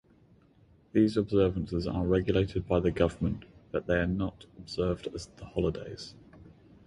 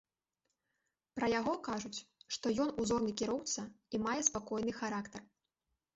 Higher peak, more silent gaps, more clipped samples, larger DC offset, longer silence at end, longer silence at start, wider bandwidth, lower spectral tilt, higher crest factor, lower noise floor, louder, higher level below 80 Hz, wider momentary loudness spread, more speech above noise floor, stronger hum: about the same, -12 dBFS vs -14 dBFS; neither; neither; neither; second, 0.4 s vs 0.7 s; second, 0.95 s vs 1.15 s; first, 11 kHz vs 8 kHz; first, -7.5 dB/octave vs -3.5 dB/octave; about the same, 20 dB vs 24 dB; second, -61 dBFS vs -87 dBFS; first, -30 LUFS vs -37 LUFS; first, -46 dBFS vs -66 dBFS; first, 14 LU vs 11 LU; second, 32 dB vs 50 dB; neither